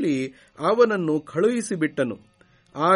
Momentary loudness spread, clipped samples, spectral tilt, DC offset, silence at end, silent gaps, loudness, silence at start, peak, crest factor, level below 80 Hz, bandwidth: 13 LU; under 0.1%; -5.5 dB/octave; under 0.1%; 0 s; none; -23 LUFS; 0 s; -6 dBFS; 18 dB; -68 dBFS; 11.5 kHz